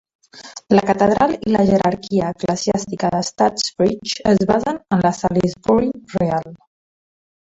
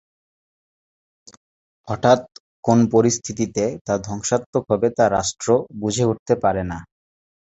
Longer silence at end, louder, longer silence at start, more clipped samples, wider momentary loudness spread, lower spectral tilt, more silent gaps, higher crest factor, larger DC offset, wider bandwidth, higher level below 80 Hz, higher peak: about the same, 0.85 s vs 0.75 s; about the same, -18 LUFS vs -20 LUFS; second, 0.35 s vs 1.85 s; neither; about the same, 6 LU vs 8 LU; about the same, -5.5 dB/octave vs -5.5 dB/octave; second, none vs 2.40-2.63 s, 3.81-3.85 s, 4.46-4.53 s, 6.19-6.26 s; about the same, 18 dB vs 20 dB; neither; about the same, 8.4 kHz vs 8.2 kHz; about the same, -48 dBFS vs -48 dBFS; about the same, -2 dBFS vs -2 dBFS